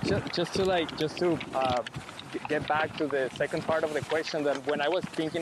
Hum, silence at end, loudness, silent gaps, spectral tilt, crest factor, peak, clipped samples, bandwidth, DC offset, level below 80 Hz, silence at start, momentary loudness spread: none; 0 s; -29 LUFS; none; -5 dB/octave; 16 dB; -14 dBFS; under 0.1%; 13 kHz; under 0.1%; -58 dBFS; 0 s; 5 LU